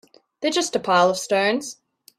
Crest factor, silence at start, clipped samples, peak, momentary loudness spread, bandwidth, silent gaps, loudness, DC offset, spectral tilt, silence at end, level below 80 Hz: 18 dB; 0.4 s; under 0.1%; -4 dBFS; 9 LU; 15.5 kHz; none; -21 LUFS; under 0.1%; -3 dB/octave; 0.45 s; -68 dBFS